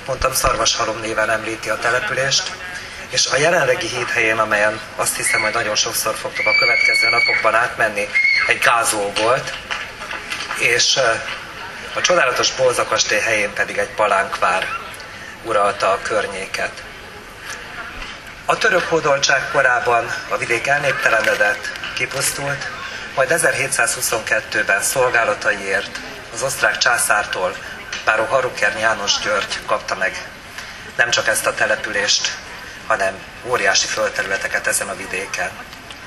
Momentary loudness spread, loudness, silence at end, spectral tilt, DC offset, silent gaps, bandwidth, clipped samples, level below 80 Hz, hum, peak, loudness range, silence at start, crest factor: 14 LU; -17 LUFS; 0 s; -1.5 dB/octave; under 0.1%; none; 14 kHz; under 0.1%; -46 dBFS; none; 0 dBFS; 4 LU; 0 s; 18 dB